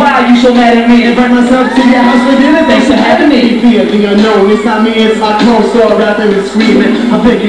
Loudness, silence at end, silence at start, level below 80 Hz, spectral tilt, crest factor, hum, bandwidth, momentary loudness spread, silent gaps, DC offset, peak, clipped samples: -6 LUFS; 0 s; 0 s; -36 dBFS; -5.5 dB/octave; 6 dB; none; 11 kHz; 3 LU; none; 0.8%; 0 dBFS; 4%